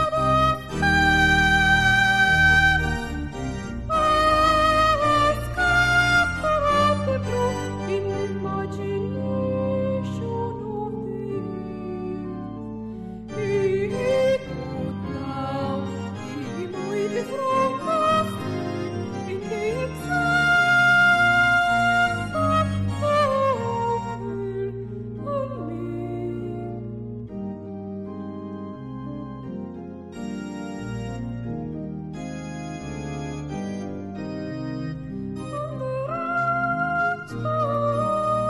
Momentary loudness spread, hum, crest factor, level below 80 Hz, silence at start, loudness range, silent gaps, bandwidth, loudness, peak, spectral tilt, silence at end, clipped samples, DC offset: 16 LU; none; 16 dB; -40 dBFS; 0 s; 14 LU; none; 14 kHz; -23 LUFS; -8 dBFS; -5.5 dB/octave; 0 s; under 0.1%; under 0.1%